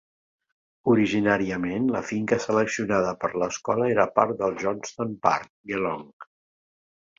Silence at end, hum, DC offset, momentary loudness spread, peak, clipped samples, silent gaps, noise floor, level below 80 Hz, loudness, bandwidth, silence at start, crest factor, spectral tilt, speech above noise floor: 0.95 s; none; under 0.1%; 8 LU; -2 dBFS; under 0.1%; 5.50-5.64 s, 6.13-6.20 s; under -90 dBFS; -60 dBFS; -25 LUFS; 7.8 kHz; 0.85 s; 24 dB; -5.5 dB/octave; over 66 dB